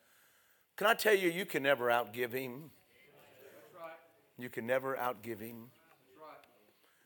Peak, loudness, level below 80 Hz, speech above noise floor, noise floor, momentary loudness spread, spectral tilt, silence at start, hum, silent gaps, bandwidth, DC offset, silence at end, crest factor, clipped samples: -14 dBFS; -34 LUFS; -88 dBFS; 36 dB; -70 dBFS; 24 LU; -4 dB/octave; 0.8 s; none; none; 19.5 kHz; under 0.1%; 0.65 s; 24 dB; under 0.1%